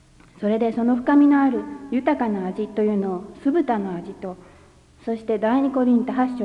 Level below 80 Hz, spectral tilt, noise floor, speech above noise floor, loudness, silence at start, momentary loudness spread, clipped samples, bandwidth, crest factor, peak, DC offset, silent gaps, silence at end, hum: -56 dBFS; -8.5 dB/octave; -51 dBFS; 30 dB; -21 LUFS; 0.4 s; 14 LU; under 0.1%; 5.4 kHz; 14 dB; -8 dBFS; under 0.1%; none; 0 s; none